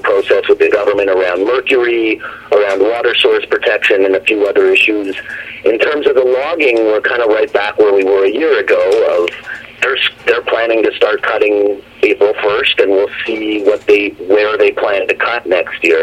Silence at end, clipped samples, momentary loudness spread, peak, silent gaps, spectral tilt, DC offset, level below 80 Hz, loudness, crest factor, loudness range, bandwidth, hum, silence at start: 0 s; under 0.1%; 5 LU; 0 dBFS; none; -4 dB/octave; under 0.1%; -52 dBFS; -12 LUFS; 12 dB; 1 LU; 10 kHz; none; 0 s